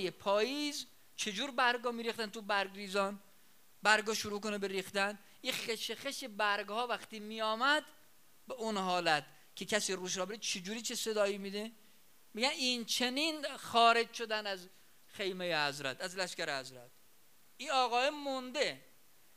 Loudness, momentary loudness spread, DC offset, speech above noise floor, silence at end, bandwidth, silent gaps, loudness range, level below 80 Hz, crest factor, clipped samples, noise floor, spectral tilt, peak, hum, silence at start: -35 LUFS; 11 LU; under 0.1%; 32 dB; 0.55 s; 15.5 kHz; none; 4 LU; -84 dBFS; 26 dB; under 0.1%; -67 dBFS; -2 dB/octave; -12 dBFS; none; 0 s